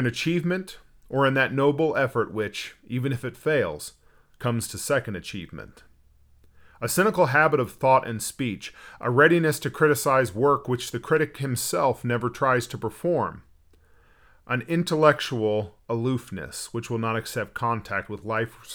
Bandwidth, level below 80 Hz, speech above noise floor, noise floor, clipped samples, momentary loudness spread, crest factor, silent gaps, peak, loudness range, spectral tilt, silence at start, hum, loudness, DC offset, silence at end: over 20 kHz; -56 dBFS; 33 dB; -57 dBFS; under 0.1%; 13 LU; 20 dB; none; -4 dBFS; 7 LU; -5 dB/octave; 0 s; none; -25 LUFS; under 0.1%; 0 s